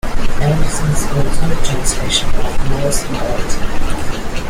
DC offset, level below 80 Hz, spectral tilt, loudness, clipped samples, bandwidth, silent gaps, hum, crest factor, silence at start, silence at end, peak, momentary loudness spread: under 0.1%; -18 dBFS; -4 dB/octave; -19 LUFS; under 0.1%; 14 kHz; none; none; 10 dB; 0.05 s; 0 s; 0 dBFS; 6 LU